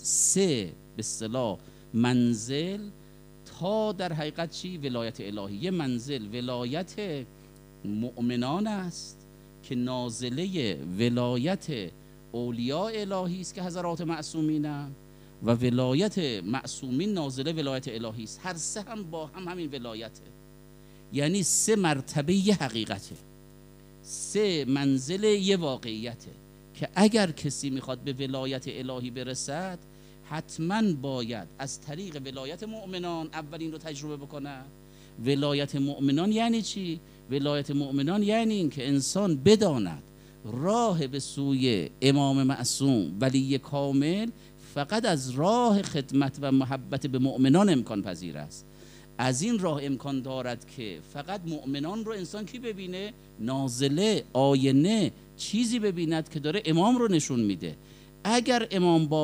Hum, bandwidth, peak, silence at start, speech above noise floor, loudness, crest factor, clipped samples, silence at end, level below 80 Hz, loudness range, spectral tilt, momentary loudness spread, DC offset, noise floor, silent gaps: none; 15.5 kHz; -8 dBFS; 0 s; 23 dB; -28 LUFS; 22 dB; under 0.1%; 0 s; -58 dBFS; 8 LU; -5 dB/octave; 14 LU; under 0.1%; -51 dBFS; none